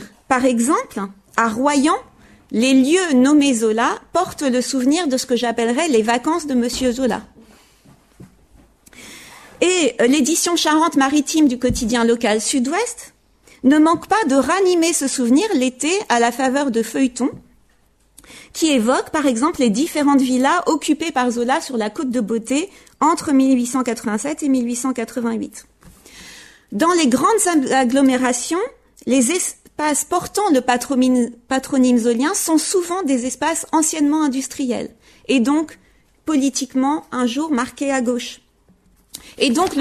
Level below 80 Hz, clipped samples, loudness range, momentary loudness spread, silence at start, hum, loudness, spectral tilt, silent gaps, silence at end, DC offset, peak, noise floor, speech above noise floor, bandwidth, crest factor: -50 dBFS; under 0.1%; 5 LU; 9 LU; 0 s; none; -18 LUFS; -3 dB/octave; none; 0 s; under 0.1%; 0 dBFS; -57 dBFS; 40 dB; 13.5 kHz; 18 dB